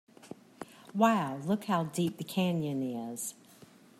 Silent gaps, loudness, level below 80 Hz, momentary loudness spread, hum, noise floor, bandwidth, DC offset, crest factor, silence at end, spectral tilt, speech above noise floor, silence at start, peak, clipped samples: none; -32 LUFS; -76 dBFS; 22 LU; none; -57 dBFS; 15.5 kHz; under 0.1%; 22 dB; 0.65 s; -5.5 dB/octave; 26 dB; 0.25 s; -12 dBFS; under 0.1%